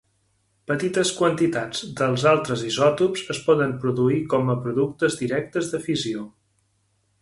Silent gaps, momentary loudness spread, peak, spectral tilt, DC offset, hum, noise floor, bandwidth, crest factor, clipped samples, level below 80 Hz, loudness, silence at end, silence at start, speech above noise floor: none; 8 LU; -4 dBFS; -5 dB/octave; under 0.1%; none; -68 dBFS; 11.5 kHz; 18 dB; under 0.1%; -60 dBFS; -23 LUFS; 0.95 s; 0.7 s; 46 dB